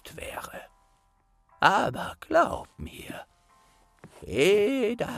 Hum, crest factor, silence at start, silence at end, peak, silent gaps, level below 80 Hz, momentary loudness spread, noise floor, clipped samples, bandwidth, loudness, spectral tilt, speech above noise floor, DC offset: none; 24 dB; 0.05 s; 0 s; -6 dBFS; none; -54 dBFS; 20 LU; -66 dBFS; under 0.1%; 15.5 kHz; -25 LUFS; -4.5 dB/octave; 41 dB; under 0.1%